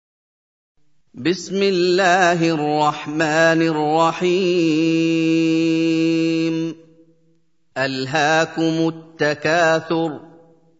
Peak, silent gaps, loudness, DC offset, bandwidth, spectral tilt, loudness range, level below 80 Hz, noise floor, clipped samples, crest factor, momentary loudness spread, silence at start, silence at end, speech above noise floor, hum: -2 dBFS; none; -18 LUFS; under 0.1%; 7.8 kHz; -5 dB/octave; 4 LU; -68 dBFS; -64 dBFS; under 0.1%; 16 dB; 8 LU; 1.15 s; 0.55 s; 46 dB; none